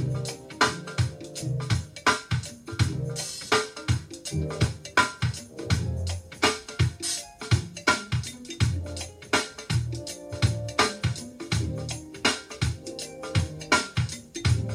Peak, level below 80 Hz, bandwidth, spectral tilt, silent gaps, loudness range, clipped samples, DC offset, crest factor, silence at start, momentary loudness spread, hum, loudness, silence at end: -6 dBFS; -44 dBFS; 16 kHz; -4 dB/octave; none; 1 LU; under 0.1%; under 0.1%; 22 dB; 0 s; 9 LU; none; -28 LUFS; 0 s